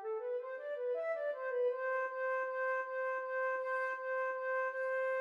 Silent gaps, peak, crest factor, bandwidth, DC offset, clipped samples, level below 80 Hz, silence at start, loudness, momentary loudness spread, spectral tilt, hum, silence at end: none; -26 dBFS; 10 dB; 6.6 kHz; under 0.1%; under 0.1%; under -90 dBFS; 0 s; -37 LUFS; 4 LU; -0.5 dB/octave; none; 0 s